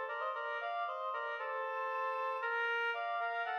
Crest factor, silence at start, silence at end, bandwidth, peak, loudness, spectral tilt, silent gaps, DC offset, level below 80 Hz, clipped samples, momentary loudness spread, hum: 12 dB; 0 s; 0 s; 15 kHz; -26 dBFS; -37 LUFS; 0.5 dB/octave; none; under 0.1%; under -90 dBFS; under 0.1%; 4 LU; none